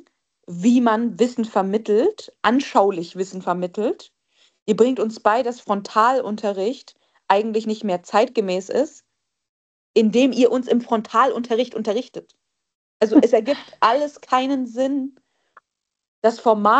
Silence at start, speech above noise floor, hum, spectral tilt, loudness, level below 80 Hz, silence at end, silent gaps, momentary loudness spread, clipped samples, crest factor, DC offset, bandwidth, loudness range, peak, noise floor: 0.5 s; 43 dB; none; -5.5 dB/octave; -20 LUFS; -70 dBFS; 0 s; 4.62-4.66 s, 9.49-9.94 s, 12.75-13.00 s, 16.08-16.22 s; 9 LU; under 0.1%; 20 dB; under 0.1%; 8.6 kHz; 2 LU; 0 dBFS; -62 dBFS